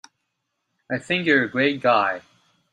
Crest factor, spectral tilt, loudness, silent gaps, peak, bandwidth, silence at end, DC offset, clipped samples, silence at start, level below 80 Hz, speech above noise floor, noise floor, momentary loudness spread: 18 dB; -5.5 dB/octave; -21 LUFS; none; -6 dBFS; 10 kHz; 0.55 s; under 0.1%; under 0.1%; 0.9 s; -68 dBFS; 56 dB; -77 dBFS; 12 LU